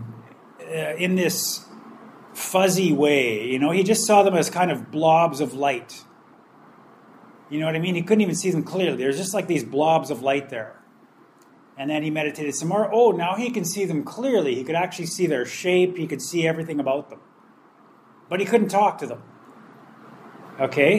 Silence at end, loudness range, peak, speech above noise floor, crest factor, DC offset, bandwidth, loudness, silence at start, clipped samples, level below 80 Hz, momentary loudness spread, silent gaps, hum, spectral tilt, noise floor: 0 s; 6 LU; -2 dBFS; 32 dB; 20 dB; under 0.1%; 15.5 kHz; -22 LUFS; 0 s; under 0.1%; -74 dBFS; 13 LU; none; none; -4.5 dB/octave; -53 dBFS